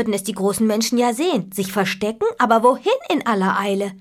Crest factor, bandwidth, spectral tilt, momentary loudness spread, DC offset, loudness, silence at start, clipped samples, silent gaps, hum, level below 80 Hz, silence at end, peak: 16 dB; 16 kHz; -4.5 dB/octave; 7 LU; under 0.1%; -19 LUFS; 0 s; under 0.1%; none; none; -60 dBFS; 0 s; -2 dBFS